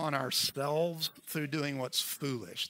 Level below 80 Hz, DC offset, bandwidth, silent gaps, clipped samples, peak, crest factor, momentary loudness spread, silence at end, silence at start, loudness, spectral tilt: -78 dBFS; under 0.1%; 16 kHz; none; under 0.1%; -14 dBFS; 20 dB; 7 LU; 0 s; 0 s; -33 LUFS; -3.5 dB/octave